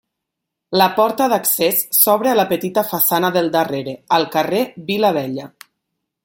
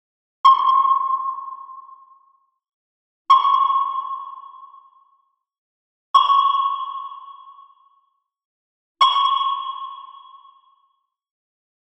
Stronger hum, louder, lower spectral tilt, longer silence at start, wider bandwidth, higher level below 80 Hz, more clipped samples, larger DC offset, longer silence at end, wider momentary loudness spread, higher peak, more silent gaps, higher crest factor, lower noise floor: neither; about the same, -16 LUFS vs -18 LUFS; first, -3.5 dB/octave vs 1 dB/octave; first, 0.7 s vs 0.45 s; first, 17 kHz vs 8.2 kHz; first, -64 dBFS vs -78 dBFS; neither; neither; second, 0.75 s vs 1.65 s; second, 9 LU vs 21 LU; about the same, 0 dBFS vs -2 dBFS; second, none vs 2.73-3.25 s, 5.58-6.14 s, 8.45-8.95 s; about the same, 18 dB vs 20 dB; first, -80 dBFS vs -68 dBFS